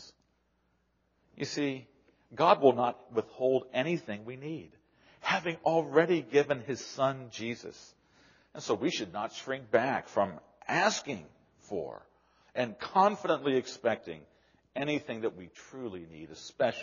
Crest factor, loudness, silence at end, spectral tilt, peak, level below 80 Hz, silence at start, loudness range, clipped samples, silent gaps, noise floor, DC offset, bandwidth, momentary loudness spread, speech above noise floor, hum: 24 dB; -31 LUFS; 0 s; -3.5 dB/octave; -8 dBFS; -74 dBFS; 0 s; 4 LU; under 0.1%; none; -74 dBFS; under 0.1%; 7.2 kHz; 17 LU; 43 dB; none